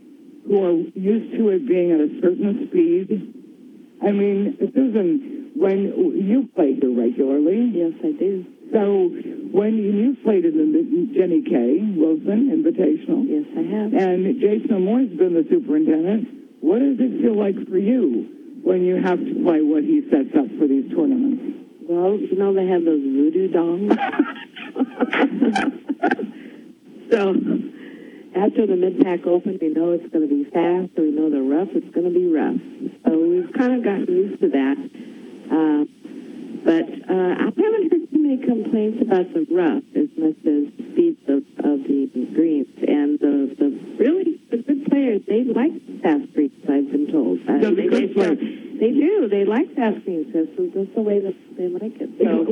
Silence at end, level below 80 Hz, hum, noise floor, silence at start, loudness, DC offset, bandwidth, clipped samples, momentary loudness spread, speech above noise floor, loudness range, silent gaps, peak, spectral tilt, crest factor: 0 s; -72 dBFS; none; -44 dBFS; 0.45 s; -20 LUFS; under 0.1%; 6.6 kHz; under 0.1%; 7 LU; 25 dB; 2 LU; none; 0 dBFS; -8.5 dB/octave; 20 dB